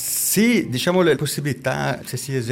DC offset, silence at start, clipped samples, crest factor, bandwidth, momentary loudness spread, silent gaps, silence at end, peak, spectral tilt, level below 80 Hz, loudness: under 0.1%; 0 s; under 0.1%; 12 dB; 17 kHz; 8 LU; none; 0 s; -8 dBFS; -4 dB/octave; -56 dBFS; -20 LUFS